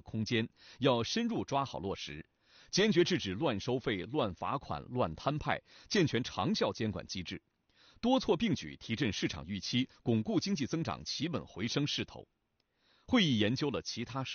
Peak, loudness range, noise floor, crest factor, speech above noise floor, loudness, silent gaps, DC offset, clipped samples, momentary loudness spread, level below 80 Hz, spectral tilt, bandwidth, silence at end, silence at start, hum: -16 dBFS; 2 LU; -78 dBFS; 18 dB; 44 dB; -34 LUFS; none; under 0.1%; under 0.1%; 10 LU; -60 dBFS; -4 dB/octave; 7 kHz; 0 s; 0.05 s; none